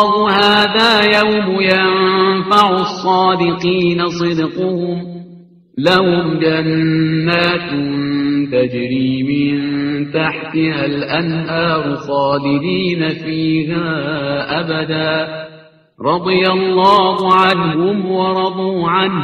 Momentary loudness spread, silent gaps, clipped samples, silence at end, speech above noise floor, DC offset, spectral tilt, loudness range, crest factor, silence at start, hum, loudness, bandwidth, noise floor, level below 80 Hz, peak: 8 LU; none; under 0.1%; 0 s; 28 dB; under 0.1%; -6.5 dB/octave; 5 LU; 14 dB; 0 s; none; -14 LUFS; 11.5 kHz; -42 dBFS; -50 dBFS; 0 dBFS